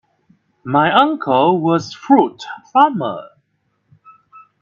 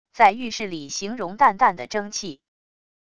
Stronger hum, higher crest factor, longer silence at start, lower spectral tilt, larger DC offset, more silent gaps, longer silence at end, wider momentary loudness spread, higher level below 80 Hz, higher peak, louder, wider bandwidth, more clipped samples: neither; about the same, 18 dB vs 20 dB; first, 0.65 s vs 0.15 s; first, -6.5 dB/octave vs -3 dB/octave; second, under 0.1% vs 0.6%; neither; first, 1.35 s vs 0.8 s; about the same, 13 LU vs 13 LU; about the same, -64 dBFS vs -60 dBFS; about the same, 0 dBFS vs -2 dBFS; first, -15 LUFS vs -22 LUFS; second, 7.2 kHz vs 10.5 kHz; neither